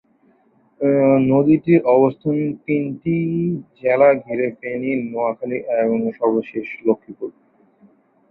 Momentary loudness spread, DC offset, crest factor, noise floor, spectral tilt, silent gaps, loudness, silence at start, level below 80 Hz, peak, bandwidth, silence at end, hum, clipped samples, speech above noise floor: 10 LU; under 0.1%; 16 dB; -58 dBFS; -12 dB/octave; none; -19 LUFS; 0.8 s; -60 dBFS; -2 dBFS; 4.2 kHz; 1 s; none; under 0.1%; 40 dB